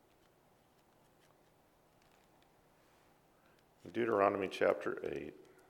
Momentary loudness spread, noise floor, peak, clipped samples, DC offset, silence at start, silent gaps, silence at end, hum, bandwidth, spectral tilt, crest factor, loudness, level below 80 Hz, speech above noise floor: 16 LU; -70 dBFS; -14 dBFS; under 0.1%; under 0.1%; 3.85 s; none; 0.35 s; none; 18.5 kHz; -6 dB/octave; 26 dB; -36 LUFS; -78 dBFS; 35 dB